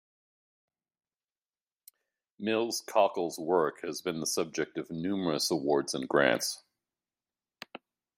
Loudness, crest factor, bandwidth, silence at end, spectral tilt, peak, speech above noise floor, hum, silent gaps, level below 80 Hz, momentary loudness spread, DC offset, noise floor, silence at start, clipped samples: -30 LUFS; 24 dB; 16 kHz; 0.4 s; -3.5 dB/octave; -8 dBFS; over 60 dB; none; none; -76 dBFS; 12 LU; under 0.1%; under -90 dBFS; 2.4 s; under 0.1%